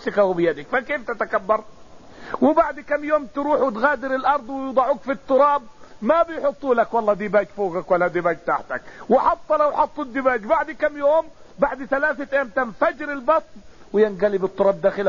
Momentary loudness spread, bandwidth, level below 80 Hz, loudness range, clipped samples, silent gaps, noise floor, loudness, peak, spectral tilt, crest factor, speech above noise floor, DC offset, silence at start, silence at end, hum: 6 LU; 7.2 kHz; -52 dBFS; 2 LU; under 0.1%; none; -42 dBFS; -21 LUFS; -4 dBFS; -4 dB/octave; 16 dB; 21 dB; 0.6%; 0 s; 0 s; none